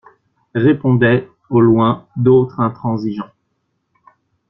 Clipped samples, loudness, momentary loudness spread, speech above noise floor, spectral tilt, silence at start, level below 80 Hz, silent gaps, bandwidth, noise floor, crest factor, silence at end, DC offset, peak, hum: under 0.1%; -15 LUFS; 12 LU; 55 dB; -10.5 dB/octave; 0.55 s; -52 dBFS; none; 5.8 kHz; -69 dBFS; 14 dB; 1.25 s; under 0.1%; -2 dBFS; none